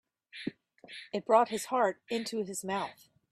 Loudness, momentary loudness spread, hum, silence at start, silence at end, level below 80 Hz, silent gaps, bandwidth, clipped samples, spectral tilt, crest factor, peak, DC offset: -32 LUFS; 17 LU; none; 0.35 s; 0.4 s; -76 dBFS; none; 15.5 kHz; under 0.1%; -3.5 dB/octave; 22 dB; -12 dBFS; under 0.1%